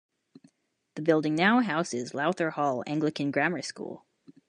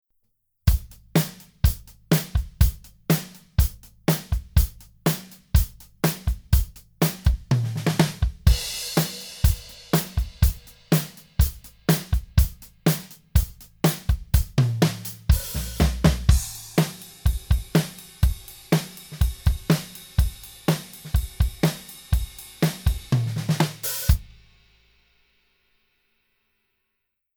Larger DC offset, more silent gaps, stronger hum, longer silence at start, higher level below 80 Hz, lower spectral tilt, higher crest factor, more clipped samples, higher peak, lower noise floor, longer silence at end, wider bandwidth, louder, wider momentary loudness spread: neither; neither; neither; first, 0.95 s vs 0.65 s; second, -78 dBFS vs -28 dBFS; about the same, -5.5 dB/octave vs -5.5 dB/octave; about the same, 22 dB vs 22 dB; neither; second, -8 dBFS vs -2 dBFS; second, -72 dBFS vs -78 dBFS; second, 0.15 s vs 3.15 s; second, 10.5 kHz vs over 20 kHz; about the same, -27 LUFS vs -25 LUFS; first, 16 LU vs 7 LU